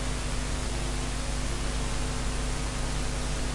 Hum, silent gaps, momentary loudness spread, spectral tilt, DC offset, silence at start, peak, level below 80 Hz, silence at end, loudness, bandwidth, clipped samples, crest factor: none; none; 0 LU; -4 dB/octave; under 0.1%; 0 s; -18 dBFS; -32 dBFS; 0 s; -32 LUFS; 11.5 kHz; under 0.1%; 12 dB